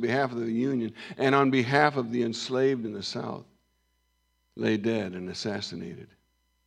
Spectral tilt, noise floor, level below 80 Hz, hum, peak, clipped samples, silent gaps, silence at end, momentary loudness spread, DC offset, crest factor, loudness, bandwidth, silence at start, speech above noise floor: -5.5 dB/octave; -73 dBFS; -72 dBFS; none; -6 dBFS; under 0.1%; none; 0.6 s; 13 LU; under 0.1%; 22 dB; -28 LUFS; 11.5 kHz; 0 s; 45 dB